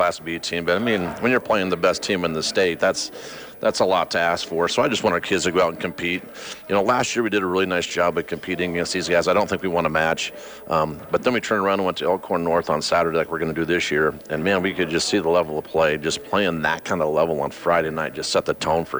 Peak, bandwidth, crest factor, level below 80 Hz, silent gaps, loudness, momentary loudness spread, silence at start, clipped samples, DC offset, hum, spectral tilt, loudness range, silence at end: -8 dBFS; over 20 kHz; 14 dB; -52 dBFS; none; -21 LUFS; 6 LU; 0 s; under 0.1%; under 0.1%; none; -4 dB/octave; 1 LU; 0 s